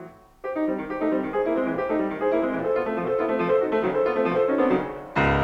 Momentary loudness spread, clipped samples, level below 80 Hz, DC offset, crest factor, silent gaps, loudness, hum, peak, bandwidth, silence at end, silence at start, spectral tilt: 5 LU; under 0.1%; -46 dBFS; under 0.1%; 14 dB; none; -24 LUFS; none; -10 dBFS; 7.6 kHz; 0 s; 0 s; -8 dB/octave